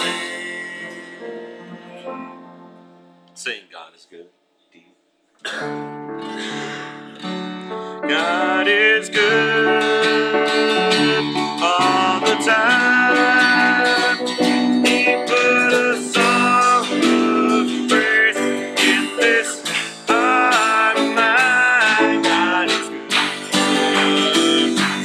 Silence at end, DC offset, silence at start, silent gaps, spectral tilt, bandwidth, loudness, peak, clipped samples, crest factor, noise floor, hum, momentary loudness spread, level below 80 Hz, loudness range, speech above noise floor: 0 s; under 0.1%; 0 s; none; -3 dB/octave; 15.5 kHz; -16 LUFS; -2 dBFS; under 0.1%; 16 dB; -61 dBFS; none; 16 LU; -70 dBFS; 18 LU; 40 dB